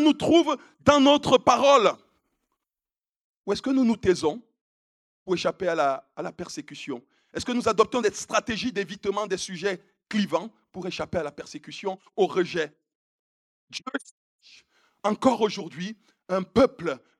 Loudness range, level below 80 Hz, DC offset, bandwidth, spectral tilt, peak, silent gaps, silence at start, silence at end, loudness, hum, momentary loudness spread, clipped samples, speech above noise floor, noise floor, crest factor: 8 LU; -60 dBFS; under 0.1%; 12.5 kHz; -4.5 dB/octave; -2 dBFS; 3.16-3.44 s, 4.61-5.26 s, 12.95-13.68 s, 14.11-14.39 s; 0 s; 0.2 s; -25 LUFS; none; 18 LU; under 0.1%; over 65 dB; under -90 dBFS; 24 dB